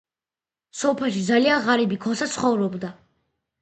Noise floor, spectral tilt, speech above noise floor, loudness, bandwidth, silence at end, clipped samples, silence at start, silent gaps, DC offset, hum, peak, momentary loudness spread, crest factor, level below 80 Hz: under -90 dBFS; -4.5 dB/octave; over 68 dB; -22 LUFS; 9 kHz; 0.7 s; under 0.1%; 0.75 s; none; under 0.1%; none; -6 dBFS; 12 LU; 18 dB; -64 dBFS